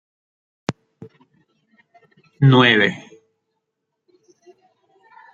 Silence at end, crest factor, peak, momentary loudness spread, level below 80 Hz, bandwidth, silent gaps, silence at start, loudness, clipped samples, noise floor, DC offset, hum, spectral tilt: 2.35 s; 22 dB; 0 dBFS; 19 LU; -66 dBFS; 7.6 kHz; none; 0.7 s; -16 LUFS; under 0.1%; -78 dBFS; under 0.1%; none; -7 dB/octave